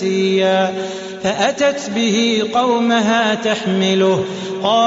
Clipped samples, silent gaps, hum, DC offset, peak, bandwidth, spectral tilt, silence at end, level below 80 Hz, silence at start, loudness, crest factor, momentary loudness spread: under 0.1%; none; none; under 0.1%; -2 dBFS; 8 kHz; -3.5 dB/octave; 0 s; -58 dBFS; 0 s; -16 LUFS; 14 dB; 7 LU